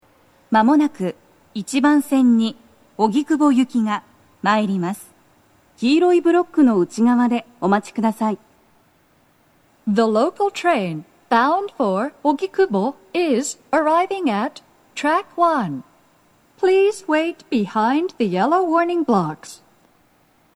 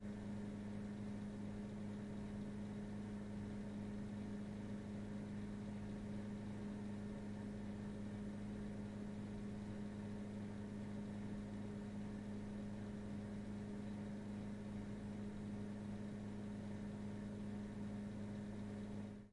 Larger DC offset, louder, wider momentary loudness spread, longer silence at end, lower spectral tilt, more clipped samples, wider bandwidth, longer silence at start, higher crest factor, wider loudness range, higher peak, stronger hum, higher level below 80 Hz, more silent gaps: neither; first, -19 LUFS vs -49 LUFS; first, 12 LU vs 1 LU; first, 1 s vs 0 s; second, -5.5 dB/octave vs -7.5 dB/octave; neither; first, 13.5 kHz vs 11 kHz; first, 0.5 s vs 0 s; first, 18 dB vs 10 dB; first, 3 LU vs 0 LU; first, -2 dBFS vs -38 dBFS; neither; second, -70 dBFS vs -62 dBFS; neither